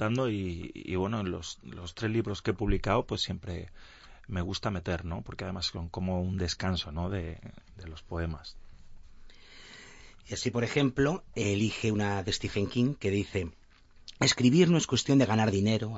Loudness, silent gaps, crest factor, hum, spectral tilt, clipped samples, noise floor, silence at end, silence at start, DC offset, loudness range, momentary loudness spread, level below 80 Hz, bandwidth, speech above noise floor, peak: -30 LUFS; none; 20 dB; none; -5.5 dB/octave; under 0.1%; -52 dBFS; 0 s; 0 s; under 0.1%; 10 LU; 18 LU; -46 dBFS; 8 kHz; 23 dB; -12 dBFS